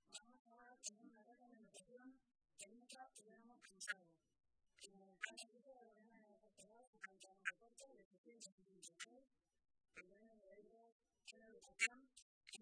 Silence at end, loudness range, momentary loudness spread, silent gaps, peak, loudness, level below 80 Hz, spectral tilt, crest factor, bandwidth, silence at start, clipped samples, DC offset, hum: 0 s; 12 LU; 18 LU; 0.39-0.45 s, 6.87-6.93 s, 8.05-8.11 s, 8.18-8.24 s, 8.52-8.58 s, 10.92-11.00 s, 12.22-12.41 s; -24 dBFS; -53 LUFS; under -90 dBFS; 0 dB/octave; 34 dB; 11 kHz; 0.05 s; under 0.1%; under 0.1%; none